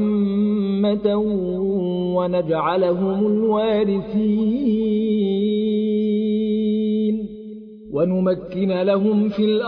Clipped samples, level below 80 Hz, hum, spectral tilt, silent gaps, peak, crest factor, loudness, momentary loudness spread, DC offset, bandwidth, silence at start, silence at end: under 0.1%; -52 dBFS; none; -11 dB/octave; none; -6 dBFS; 14 dB; -20 LUFS; 4 LU; under 0.1%; 4.9 kHz; 0 s; 0 s